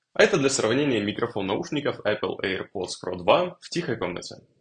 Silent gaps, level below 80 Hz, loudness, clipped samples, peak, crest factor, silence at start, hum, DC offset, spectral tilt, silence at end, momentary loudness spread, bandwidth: none; -62 dBFS; -25 LUFS; under 0.1%; -2 dBFS; 22 dB; 0.15 s; none; under 0.1%; -4 dB/octave; 0.2 s; 11 LU; 10 kHz